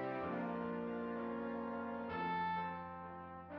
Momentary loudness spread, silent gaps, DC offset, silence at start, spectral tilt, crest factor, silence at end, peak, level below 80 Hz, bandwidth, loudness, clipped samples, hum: 10 LU; none; under 0.1%; 0 s; -5 dB/octave; 12 dB; 0 s; -30 dBFS; -72 dBFS; 5.6 kHz; -42 LUFS; under 0.1%; none